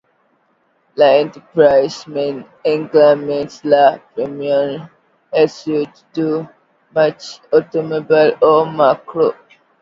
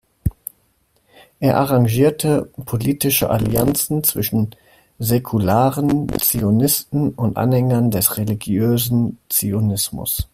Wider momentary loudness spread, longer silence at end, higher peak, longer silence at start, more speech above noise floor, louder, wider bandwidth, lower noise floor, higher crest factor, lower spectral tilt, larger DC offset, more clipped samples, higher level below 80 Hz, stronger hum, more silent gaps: first, 11 LU vs 7 LU; first, 0.5 s vs 0.1 s; about the same, 0 dBFS vs 0 dBFS; first, 0.95 s vs 0.25 s; about the same, 46 dB vs 44 dB; first, -15 LUFS vs -18 LUFS; second, 7.6 kHz vs 16 kHz; about the same, -60 dBFS vs -62 dBFS; about the same, 16 dB vs 18 dB; about the same, -6 dB/octave vs -5.5 dB/octave; neither; neither; second, -62 dBFS vs -40 dBFS; neither; neither